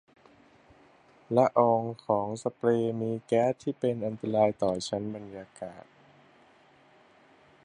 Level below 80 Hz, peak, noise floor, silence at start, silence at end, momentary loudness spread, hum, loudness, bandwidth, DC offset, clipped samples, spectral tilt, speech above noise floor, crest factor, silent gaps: -68 dBFS; -8 dBFS; -60 dBFS; 1.3 s; 1.85 s; 17 LU; none; -28 LUFS; 10.5 kHz; under 0.1%; under 0.1%; -6.5 dB/octave; 32 dB; 22 dB; none